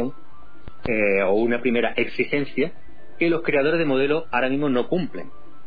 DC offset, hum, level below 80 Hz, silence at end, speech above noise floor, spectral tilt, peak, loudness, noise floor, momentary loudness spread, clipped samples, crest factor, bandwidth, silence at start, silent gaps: 4%; none; -52 dBFS; 0.4 s; 27 dB; -9 dB/octave; -8 dBFS; -22 LUFS; -49 dBFS; 8 LU; under 0.1%; 16 dB; 5 kHz; 0 s; none